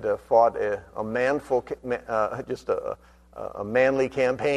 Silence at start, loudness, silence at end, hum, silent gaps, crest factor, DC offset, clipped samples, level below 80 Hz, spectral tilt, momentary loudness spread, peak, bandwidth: 0 s; -25 LUFS; 0 s; none; none; 20 dB; under 0.1%; under 0.1%; -54 dBFS; -6 dB/octave; 14 LU; -6 dBFS; 11 kHz